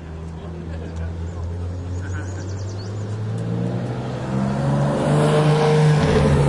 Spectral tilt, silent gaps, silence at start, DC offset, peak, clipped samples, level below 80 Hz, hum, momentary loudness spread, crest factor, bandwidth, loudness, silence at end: -7 dB/octave; none; 0 s; under 0.1%; -4 dBFS; under 0.1%; -38 dBFS; none; 14 LU; 16 dB; 11.5 kHz; -21 LUFS; 0 s